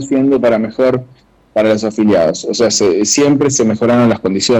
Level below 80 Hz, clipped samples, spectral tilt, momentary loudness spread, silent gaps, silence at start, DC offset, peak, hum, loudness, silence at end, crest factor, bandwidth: -48 dBFS; under 0.1%; -4.5 dB/octave; 4 LU; none; 0 s; under 0.1%; -4 dBFS; none; -12 LUFS; 0 s; 8 dB; over 20 kHz